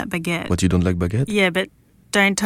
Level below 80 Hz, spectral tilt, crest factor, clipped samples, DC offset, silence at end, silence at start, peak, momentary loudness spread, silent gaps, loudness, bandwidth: -40 dBFS; -5 dB/octave; 16 dB; under 0.1%; under 0.1%; 0 s; 0 s; -4 dBFS; 6 LU; none; -20 LUFS; 16 kHz